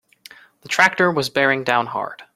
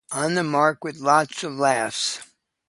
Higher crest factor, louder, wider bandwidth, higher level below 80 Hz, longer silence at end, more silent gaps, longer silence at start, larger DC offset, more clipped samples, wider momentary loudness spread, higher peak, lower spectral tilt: about the same, 20 dB vs 20 dB; first, -18 LUFS vs -22 LUFS; first, 16 kHz vs 11.5 kHz; first, -64 dBFS vs -70 dBFS; second, 0.15 s vs 0.45 s; neither; first, 0.65 s vs 0.1 s; neither; neither; first, 10 LU vs 7 LU; about the same, 0 dBFS vs -2 dBFS; about the same, -4 dB/octave vs -3.5 dB/octave